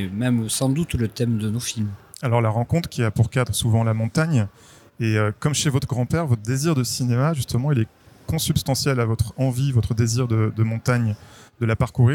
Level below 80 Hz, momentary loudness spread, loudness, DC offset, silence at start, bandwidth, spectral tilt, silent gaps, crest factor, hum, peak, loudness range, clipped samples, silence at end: -44 dBFS; 5 LU; -22 LUFS; under 0.1%; 0 s; 17 kHz; -5.5 dB/octave; none; 16 dB; none; -6 dBFS; 1 LU; under 0.1%; 0 s